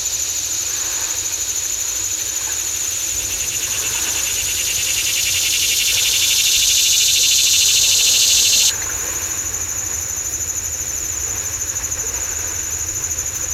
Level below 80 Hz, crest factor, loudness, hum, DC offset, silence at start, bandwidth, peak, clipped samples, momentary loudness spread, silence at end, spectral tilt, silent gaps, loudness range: -42 dBFS; 18 dB; -15 LUFS; none; under 0.1%; 0 s; 16 kHz; 0 dBFS; under 0.1%; 9 LU; 0 s; 1.5 dB/octave; none; 8 LU